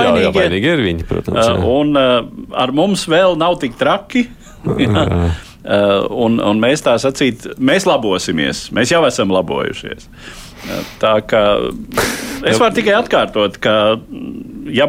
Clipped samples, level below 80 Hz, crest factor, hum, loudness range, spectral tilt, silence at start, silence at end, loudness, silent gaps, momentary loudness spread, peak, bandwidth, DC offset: under 0.1%; -36 dBFS; 12 dB; none; 3 LU; -5 dB/octave; 0 s; 0 s; -14 LUFS; none; 12 LU; -2 dBFS; 16 kHz; under 0.1%